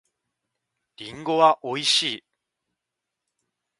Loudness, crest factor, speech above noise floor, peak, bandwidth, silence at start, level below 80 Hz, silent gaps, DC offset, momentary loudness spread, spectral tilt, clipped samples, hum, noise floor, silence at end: -21 LUFS; 24 dB; 62 dB; -4 dBFS; 11.5 kHz; 1 s; -72 dBFS; none; under 0.1%; 19 LU; -2.5 dB/octave; under 0.1%; none; -84 dBFS; 1.65 s